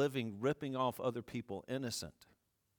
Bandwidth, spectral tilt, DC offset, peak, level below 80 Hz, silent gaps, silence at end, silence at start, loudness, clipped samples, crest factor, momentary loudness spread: 19 kHz; -5 dB/octave; under 0.1%; -22 dBFS; -72 dBFS; none; 0.65 s; 0 s; -40 LUFS; under 0.1%; 18 dB; 8 LU